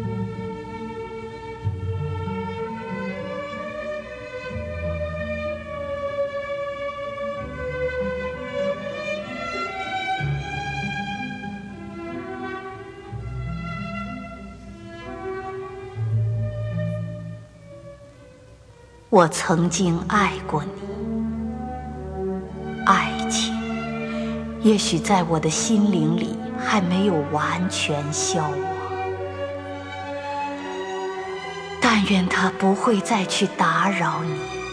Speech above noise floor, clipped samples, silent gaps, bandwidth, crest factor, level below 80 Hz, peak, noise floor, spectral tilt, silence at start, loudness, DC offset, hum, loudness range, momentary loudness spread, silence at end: 27 dB; under 0.1%; none; 11 kHz; 24 dB; -44 dBFS; -2 dBFS; -48 dBFS; -5 dB/octave; 0 s; -24 LUFS; under 0.1%; none; 9 LU; 14 LU; 0 s